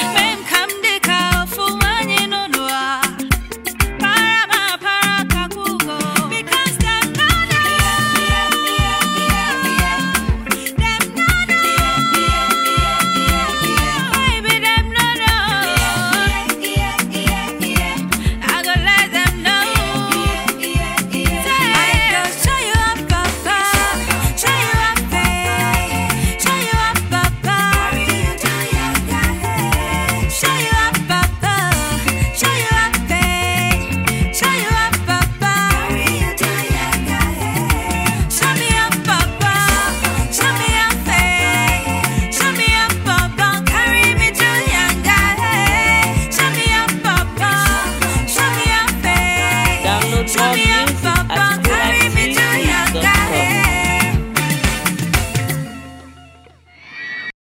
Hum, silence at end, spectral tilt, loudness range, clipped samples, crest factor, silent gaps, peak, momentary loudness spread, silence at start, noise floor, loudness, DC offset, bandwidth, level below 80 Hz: none; 0.15 s; -3 dB/octave; 3 LU; under 0.1%; 16 dB; none; 0 dBFS; 5 LU; 0 s; -45 dBFS; -15 LUFS; under 0.1%; 16.5 kHz; -26 dBFS